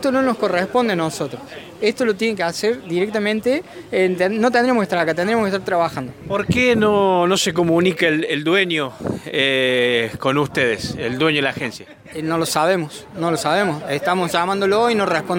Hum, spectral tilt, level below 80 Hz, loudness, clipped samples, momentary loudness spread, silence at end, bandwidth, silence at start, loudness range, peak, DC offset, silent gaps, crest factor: none; -4.5 dB/octave; -52 dBFS; -18 LUFS; under 0.1%; 9 LU; 0 s; 17 kHz; 0 s; 3 LU; -4 dBFS; under 0.1%; none; 16 dB